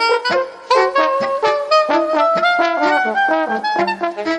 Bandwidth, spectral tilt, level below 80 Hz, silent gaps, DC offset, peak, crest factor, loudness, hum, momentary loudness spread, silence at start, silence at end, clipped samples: 10.5 kHz; -3.5 dB/octave; -64 dBFS; none; under 0.1%; -2 dBFS; 14 dB; -16 LUFS; none; 4 LU; 0 s; 0 s; under 0.1%